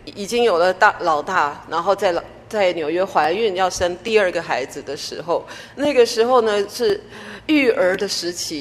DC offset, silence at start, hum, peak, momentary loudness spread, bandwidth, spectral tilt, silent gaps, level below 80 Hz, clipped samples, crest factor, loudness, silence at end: under 0.1%; 0.05 s; none; 0 dBFS; 11 LU; 14 kHz; -3.5 dB/octave; none; -52 dBFS; under 0.1%; 18 dB; -19 LUFS; 0 s